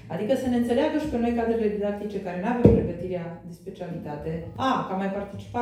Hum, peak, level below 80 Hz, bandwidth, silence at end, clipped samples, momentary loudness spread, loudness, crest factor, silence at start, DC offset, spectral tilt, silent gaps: none; -2 dBFS; -42 dBFS; 13.5 kHz; 0 s; under 0.1%; 15 LU; -26 LUFS; 24 dB; 0.05 s; under 0.1%; -8 dB/octave; none